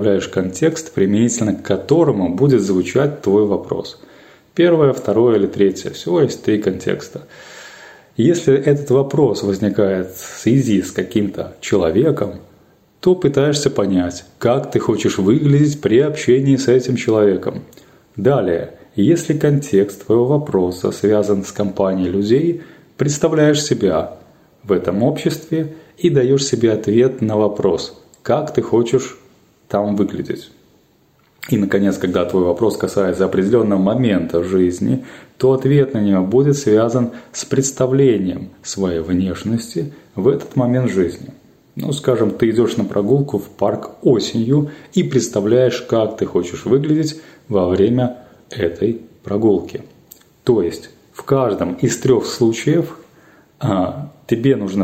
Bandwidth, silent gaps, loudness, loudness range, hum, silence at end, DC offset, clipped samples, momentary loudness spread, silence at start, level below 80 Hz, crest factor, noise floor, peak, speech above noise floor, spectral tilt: 16 kHz; none; -17 LUFS; 4 LU; none; 0 s; under 0.1%; under 0.1%; 11 LU; 0 s; -52 dBFS; 14 dB; -55 dBFS; -2 dBFS; 39 dB; -6.5 dB/octave